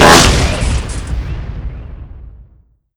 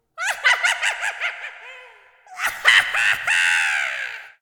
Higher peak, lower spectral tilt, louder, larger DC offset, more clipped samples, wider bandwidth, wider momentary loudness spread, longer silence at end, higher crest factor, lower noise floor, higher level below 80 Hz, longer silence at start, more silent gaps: about the same, 0 dBFS vs 0 dBFS; first, -3.5 dB/octave vs 2.5 dB/octave; first, -13 LUFS vs -18 LUFS; neither; first, 1% vs under 0.1%; about the same, over 20 kHz vs 19.5 kHz; first, 25 LU vs 17 LU; first, 0.55 s vs 0.15 s; second, 14 dB vs 22 dB; about the same, -49 dBFS vs -48 dBFS; first, -20 dBFS vs -64 dBFS; second, 0 s vs 0.15 s; neither